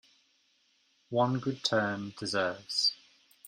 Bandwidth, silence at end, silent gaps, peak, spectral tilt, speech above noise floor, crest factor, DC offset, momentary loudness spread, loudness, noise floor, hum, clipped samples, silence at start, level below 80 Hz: 14 kHz; 0.55 s; none; -14 dBFS; -4 dB/octave; 40 dB; 20 dB; under 0.1%; 7 LU; -31 LUFS; -71 dBFS; none; under 0.1%; 1.1 s; -74 dBFS